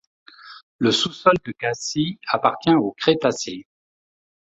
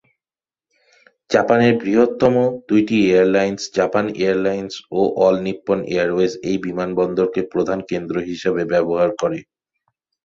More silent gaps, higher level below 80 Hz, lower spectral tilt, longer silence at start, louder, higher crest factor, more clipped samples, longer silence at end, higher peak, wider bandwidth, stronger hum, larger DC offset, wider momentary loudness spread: first, 0.63-0.79 s vs none; second, -60 dBFS vs -54 dBFS; second, -4.5 dB/octave vs -6 dB/octave; second, 0.45 s vs 1.3 s; second, -21 LUFS vs -18 LUFS; about the same, 20 dB vs 18 dB; neither; about the same, 0.95 s vs 0.85 s; about the same, -2 dBFS vs -2 dBFS; about the same, 8.2 kHz vs 7.6 kHz; neither; neither; about the same, 8 LU vs 8 LU